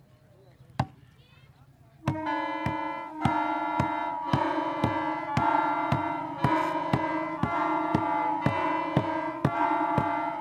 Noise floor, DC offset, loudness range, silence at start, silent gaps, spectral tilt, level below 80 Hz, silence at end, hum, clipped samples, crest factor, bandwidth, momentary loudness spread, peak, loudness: -56 dBFS; under 0.1%; 4 LU; 0.6 s; none; -7.5 dB/octave; -54 dBFS; 0 s; none; under 0.1%; 20 dB; 13 kHz; 6 LU; -8 dBFS; -28 LUFS